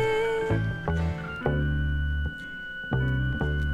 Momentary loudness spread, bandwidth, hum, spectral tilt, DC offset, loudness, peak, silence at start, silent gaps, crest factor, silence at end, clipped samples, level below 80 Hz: 7 LU; 9.4 kHz; none; -7.5 dB/octave; under 0.1%; -28 LUFS; -10 dBFS; 0 s; none; 18 dB; 0 s; under 0.1%; -32 dBFS